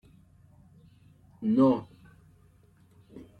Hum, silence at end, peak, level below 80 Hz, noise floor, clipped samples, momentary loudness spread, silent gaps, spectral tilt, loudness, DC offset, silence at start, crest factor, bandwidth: none; 0.2 s; -12 dBFS; -66 dBFS; -60 dBFS; under 0.1%; 28 LU; none; -9.5 dB/octave; -26 LUFS; under 0.1%; 1.4 s; 20 dB; 4.9 kHz